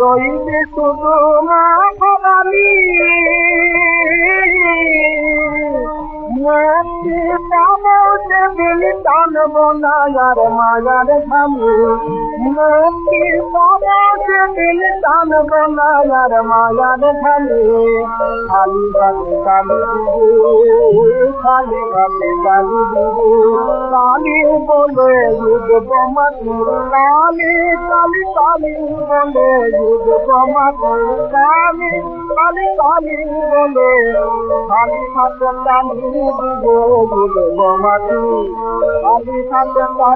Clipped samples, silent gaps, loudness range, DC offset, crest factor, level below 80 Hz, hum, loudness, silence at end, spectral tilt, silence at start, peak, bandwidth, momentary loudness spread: under 0.1%; none; 3 LU; under 0.1%; 10 dB; -36 dBFS; none; -12 LUFS; 0 s; -4 dB/octave; 0 s; 0 dBFS; 4.3 kHz; 7 LU